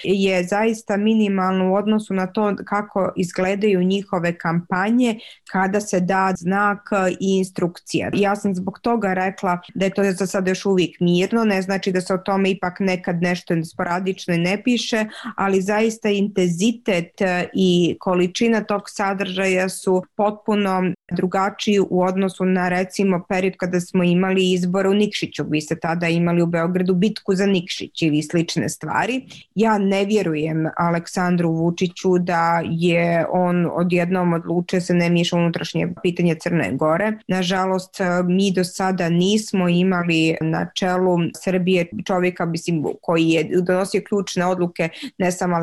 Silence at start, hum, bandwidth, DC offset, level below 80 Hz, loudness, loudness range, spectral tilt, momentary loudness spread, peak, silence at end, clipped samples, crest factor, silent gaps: 0 s; none; 12.5 kHz; 0.1%; -58 dBFS; -20 LUFS; 2 LU; -6 dB/octave; 5 LU; -8 dBFS; 0 s; under 0.1%; 12 dB; none